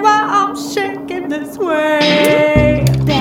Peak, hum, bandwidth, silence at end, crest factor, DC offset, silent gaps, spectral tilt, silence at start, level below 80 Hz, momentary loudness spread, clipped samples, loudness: 0 dBFS; none; 17.5 kHz; 0 s; 14 dB; under 0.1%; none; -5.5 dB/octave; 0 s; -32 dBFS; 10 LU; under 0.1%; -14 LUFS